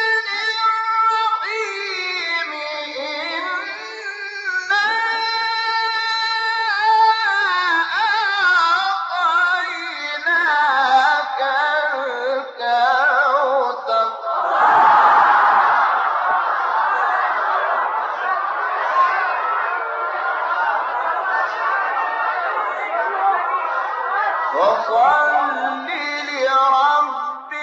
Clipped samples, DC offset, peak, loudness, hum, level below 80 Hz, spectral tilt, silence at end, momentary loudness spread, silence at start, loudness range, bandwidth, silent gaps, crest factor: under 0.1%; under 0.1%; -4 dBFS; -18 LUFS; none; -70 dBFS; 3.5 dB/octave; 0 s; 8 LU; 0 s; 5 LU; 8 kHz; none; 16 dB